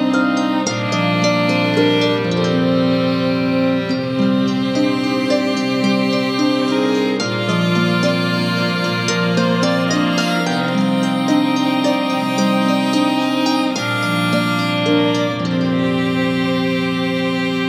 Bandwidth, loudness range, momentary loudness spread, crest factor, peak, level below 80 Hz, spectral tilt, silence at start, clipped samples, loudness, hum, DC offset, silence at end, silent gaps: 15 kHz; 1 LU; 3 LU; 14 dB; -2 dBFS; -60 dBFS; -5.5 dB/octave; 0 s; under 0.1%; -17 LUFS; none; under 0.1%; 0 s; none